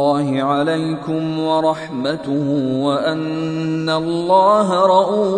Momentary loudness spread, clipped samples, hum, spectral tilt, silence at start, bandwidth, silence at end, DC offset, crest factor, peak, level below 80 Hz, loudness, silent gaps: 8 LU; under 0.1%; none; -6.5 dB/octave; 0 s; 10.5 kHz; 0 s; under 0.1%; 16 dB; -2 dBFS; -60 dBFS; -17 LUFS; none